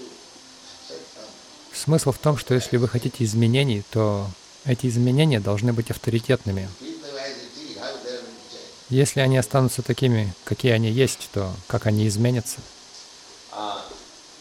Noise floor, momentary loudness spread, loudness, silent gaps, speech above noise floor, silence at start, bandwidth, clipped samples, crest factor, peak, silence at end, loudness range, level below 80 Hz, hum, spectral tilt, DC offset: -46 dBFS; 22 LU; -23 LUFS; none; 24 dB; 0 s; 16 kHz; under 0.1%; 16 dB; -6 dBFS; 0.05 s; 5 LU; -54 dBFS; none; -6 dB/octave; under 0.1%